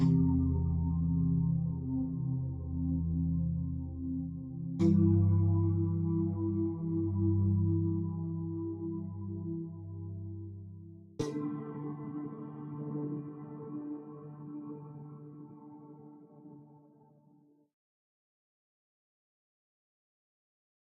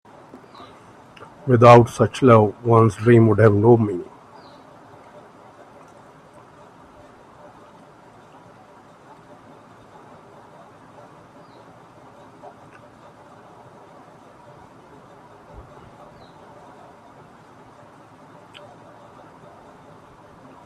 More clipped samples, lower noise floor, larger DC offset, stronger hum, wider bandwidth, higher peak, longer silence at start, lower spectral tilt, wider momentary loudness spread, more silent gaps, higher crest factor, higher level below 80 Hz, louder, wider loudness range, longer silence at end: neither; first, -65 dBFS vs -48 dBFS; neither; neither; second, 4 kHz vs 10.5 kHz; second, -16 dBFS vs 0 dBFS; second, 0 s vs 1.45 s; first, -12 dB/octave vs -8 dB/octave; about the same, 20 LU vs 21 LU; neither; about the same, 18 dB vs 22 dB; about the same, -52 dBFS vs -56 dBFS; second, -33 LUFS vs -15 LUFS; first, 16 LU vs 9 LU; second, 4.05 s vs 16.6 s